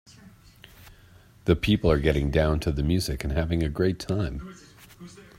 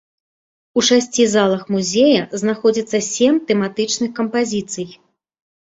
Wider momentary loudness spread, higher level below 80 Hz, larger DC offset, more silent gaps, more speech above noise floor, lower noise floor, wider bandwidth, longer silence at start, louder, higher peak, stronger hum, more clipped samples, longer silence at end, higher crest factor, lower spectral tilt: first, 19 LU vs 8 LU; first, -36 dBFS vs -60 dBFS; neither; neither; second, 29 dB vs over 73 dB; second, -53 dBFS vs under -90 dBFS; first, 16 kHz vs 8.2 kHz; about the same, 0.85 s vs 0.75 s; second, -25 LUFS vs -17 LUFS; second, -6 dBFS vs -2 dBFS; neither; neither; second, 0.15 s vs 0.8 s; about the same, 20 dB vs 16 dB; first, -6.5 dB/octave vs -3.5 dB/octave